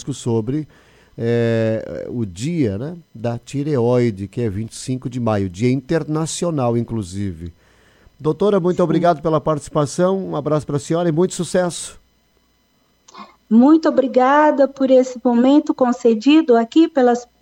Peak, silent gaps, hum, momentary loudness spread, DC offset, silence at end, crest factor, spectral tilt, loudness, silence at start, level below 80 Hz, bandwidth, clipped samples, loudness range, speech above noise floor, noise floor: -4 dBFS; none; none; 13 LU; under 0.1%; 0.2 s; 14 dB; -6.5 dB/octave; -18 LUFS; 0 s; -50 dBFS; 11.5 kHz; under 0.1%; 7 LU; 43 dB; -60 dBFS